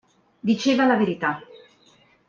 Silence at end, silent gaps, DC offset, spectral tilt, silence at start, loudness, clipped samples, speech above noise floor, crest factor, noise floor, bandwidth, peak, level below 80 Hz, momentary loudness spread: 0.85 s; none; under 0.1%; -5.5 dB/octave; 0.45 s; -22 LUFS; under 0.1%; 37 dB; 18 dB; -58 dBFS; 7.4 kHz; -6 dBFS; -68 dBFS; 11 LU